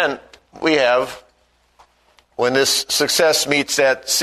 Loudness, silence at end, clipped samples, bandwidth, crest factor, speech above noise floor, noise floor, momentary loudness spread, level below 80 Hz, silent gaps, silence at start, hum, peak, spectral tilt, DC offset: -16 LUFS; 0 s; under 0.1%; 13.5 kHz; 18 dB; 42 dB; -60 dBFS; 9 LU; -58 dBFS; none; 0 s; 60 Hz at -55 dBFS; 0 dBFS; -1.5 dB/octave; under 0.1%